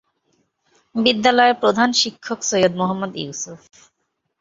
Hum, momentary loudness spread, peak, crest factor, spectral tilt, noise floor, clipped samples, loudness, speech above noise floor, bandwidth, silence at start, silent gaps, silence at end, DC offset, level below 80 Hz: none; 14 LU; 0 dBFS; 20 dB; -3 dB/octave; -67 dBFS; under 0.1%; -18 LUFS; 48 dB; 7.8 kHz; 0.95 s; none; 0.85 s; under 0.1%; -62 dBFS